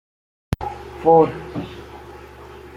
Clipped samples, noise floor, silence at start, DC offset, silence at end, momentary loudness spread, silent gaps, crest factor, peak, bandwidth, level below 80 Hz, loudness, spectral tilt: under 0.1%; -40 dBFS; 0.5 s; under 0.1%; 0.1 s; 25 LU; none; 20 dB; -2 dBFS; 12.5 kHz; -44 dBFS; -20 LUFS; -8 dB/octave